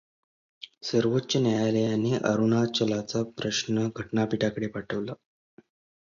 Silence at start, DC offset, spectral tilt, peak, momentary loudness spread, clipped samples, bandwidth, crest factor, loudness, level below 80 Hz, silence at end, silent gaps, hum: 0.6 s; under 0.1%; -5.5 dB/octave; -8 dBFS; 10 LU; under 0.1%; 7.6 kHz; 20 dB; -27 LUFS; -62 dBFS; 0.9 s; none; none